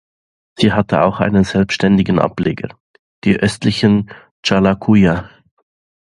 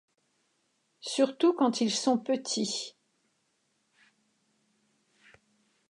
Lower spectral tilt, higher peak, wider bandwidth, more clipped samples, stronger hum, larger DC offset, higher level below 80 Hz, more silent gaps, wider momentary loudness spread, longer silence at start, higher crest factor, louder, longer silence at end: first, -6.5 dB/octave vs -3.5 dB/octave; first, 0 dBFS vs -12 dBFS; about the same, 11 kHz vs 11 kHz; neither; neither; neither; first, -40 dBFS vs -86 dBFS; first, 2.80-3.22 s, 4.31-4.43 s vs none; about the same, 9 LU vs 10 LU; second, 0.6 s vs 1.05 s; about the same, 16 dB vs 20 dB; first, -15 LUFS vs -28 LUFS; second, 0.75 s vs 3 s